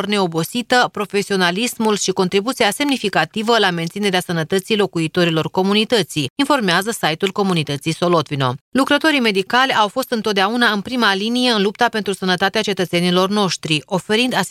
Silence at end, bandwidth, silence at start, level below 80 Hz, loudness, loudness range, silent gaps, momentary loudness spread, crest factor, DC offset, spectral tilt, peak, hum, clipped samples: 0 s; 16 kHz; 0 s; -60 dBFS; -17 LUFS; 1 LU; 6.30-6.36 s, 8.61-8.72 s; 5 LU; 16 dB; under 0.1%; -4 dB/octave; 0 dBFS; none; under 0.1%